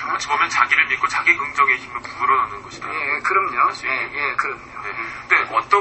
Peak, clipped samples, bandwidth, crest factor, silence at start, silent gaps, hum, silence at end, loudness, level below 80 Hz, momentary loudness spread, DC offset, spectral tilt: 0 dBFS; under 0.1%; 8.4 kHz; 20 dB; 0 s; none; none; 0 s; -18 LUFS; -54 dBFS; 12 LU; under 0.1%; -2 dB/octave